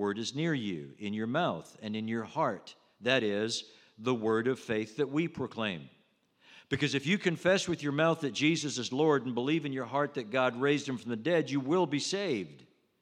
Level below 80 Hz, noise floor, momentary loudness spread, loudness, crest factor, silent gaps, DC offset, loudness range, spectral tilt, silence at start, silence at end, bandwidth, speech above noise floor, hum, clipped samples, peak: -74 dBFS; -69 dBFS; 9 LU; -31 LUFS; 20 dB; none; under 0.1%; 4 LU; -5 dB/octave; 0 s; 0.4 s; 12 kHz; 37 dB; none; under 0.1%; -12 dBFS